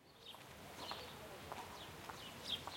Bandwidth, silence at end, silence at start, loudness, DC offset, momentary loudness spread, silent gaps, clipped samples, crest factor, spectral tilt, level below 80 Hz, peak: 16.5 kHz; 0 s; 0 s; -50 LUFS; under 0.1%; 10 LU; none; under 0.1%; 22 dB; -2.5 dB/octave; -72 dBFS; -30 dBFS